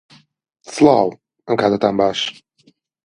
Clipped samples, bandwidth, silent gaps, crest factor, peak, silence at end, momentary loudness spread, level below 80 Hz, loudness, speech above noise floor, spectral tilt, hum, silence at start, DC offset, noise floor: under 0.1%; 11 kHz; none; 18 dB; 0 dBFS; 0.75 s; 11 LU; -56 dBFS; -17 LUFS; 42 dB; -5 dB/octave; none; 0.7 s; under 0.1%; -57 dBFS